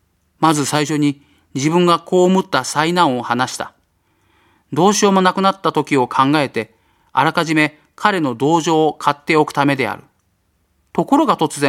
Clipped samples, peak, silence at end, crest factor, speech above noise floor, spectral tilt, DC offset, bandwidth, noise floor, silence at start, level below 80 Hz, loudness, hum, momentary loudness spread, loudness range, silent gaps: under 0.1%; 0 dBFS; 0 s; 16 dB; 48 dB; -4.5 dB/octave; under 0.1%; 16 kHz; -63 dBFS; 0.4 s; -60 dBFS; -16 LUFS; none; 9 LU; 1 LU; none